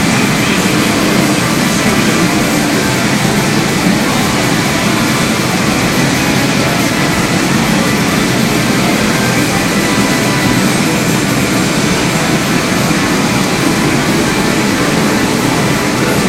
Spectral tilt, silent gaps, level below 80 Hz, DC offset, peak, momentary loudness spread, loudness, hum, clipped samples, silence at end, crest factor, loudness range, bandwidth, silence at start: -4 dB/octave; none; -34 dBFS; under 0.1%; 0 dBFS; 1 LU; -11 LUFS; none; under 0.1%; 0 s; 12 dB; 1 LU; 16 kHz; 0 s